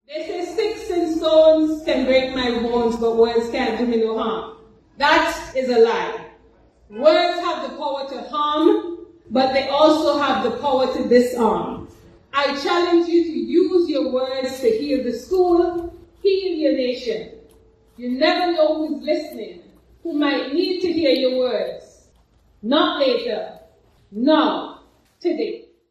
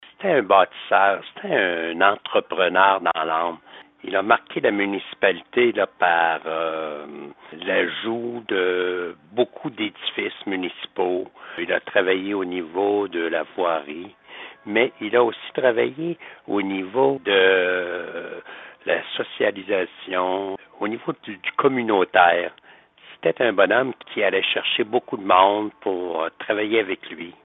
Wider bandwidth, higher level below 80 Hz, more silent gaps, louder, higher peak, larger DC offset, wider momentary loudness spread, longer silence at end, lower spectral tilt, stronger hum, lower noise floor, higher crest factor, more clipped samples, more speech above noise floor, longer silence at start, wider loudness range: first, 13 kHz vs 4 kHz; first, -52 dBFS vs -70 dBFS; neither; first, -19 LUFS vs -22 LUFS; about the same, -2 dBFS vs 0 dBFS; neither; about the same, 13 LU vs 13 LU; first, 0.35 s vs 0.15 s; first, -4.5 dB/octave vs -1.5 dB/octave; neither; first, -56 dBFS vs -48 dBFS; about the same, 18 dB vs 22 dB; neither; first, 37 dB vs 27 dB; about the same, 0.1 s vs 0 s; about the same, 4 LU vs 5 LU